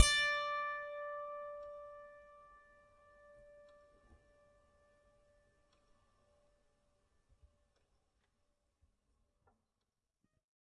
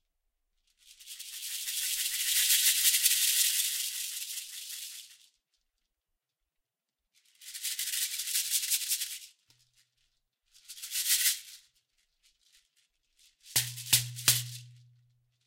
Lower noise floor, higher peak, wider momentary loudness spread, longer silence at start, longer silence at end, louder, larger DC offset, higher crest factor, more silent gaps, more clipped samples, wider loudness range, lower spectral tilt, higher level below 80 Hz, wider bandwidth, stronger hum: about the same, -89 dBFS vs -88 dBFS; second, -10 dBFS vs -4 dBFS; first, 28 LU vs 20 LU; second, 0 s vs 0.9 s; first, 8.25 s vs 0.7 s; second, -38 LUFS vs -28 LUFS; neither; about the same, 32 dB vs 30 dB; neither; neither; first, 25 LU vs 13 LU; first, -0.5 dB/octave vs 1.5 dB/octave; first, -60 dBFS vs -72 dBFS; second, 10.5 kHz vs 16 kHz; neither